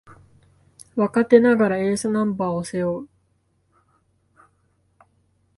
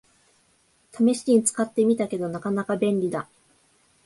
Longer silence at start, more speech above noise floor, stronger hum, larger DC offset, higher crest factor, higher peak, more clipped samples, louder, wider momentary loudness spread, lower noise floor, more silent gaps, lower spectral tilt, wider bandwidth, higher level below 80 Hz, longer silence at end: about the same, 0.95 s vs 0.95 s; first, 47 dB vs 41 dB; neither; neither; first, 22 dB vs 16 dB; first, -2 dBFS vs -8 dBFS; neither; first, -20 LUFS vs -24 LUFS; about the same, 11 LU vs 9 LU; about the same, -66 dBFS vs -64 dBFS; neither; about the same, -6.5 dB/octave vs -5.5 dB/octave; about the same, 11.5 kHz vs 11.5 kHz; first, -60 dBFS vs -68 dBFS; first, 2.5 s vs 0.8 s